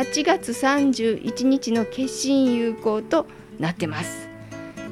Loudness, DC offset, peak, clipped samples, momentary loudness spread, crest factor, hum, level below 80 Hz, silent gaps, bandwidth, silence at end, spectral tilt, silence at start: -22 LUFS; under 0.1%; -8 dBFS; under 0.1%; 16 LU; 16 dB; none; -56 dBFS; none; 14.5 kHz; 0 s; -4.5 dB/octave; 0 s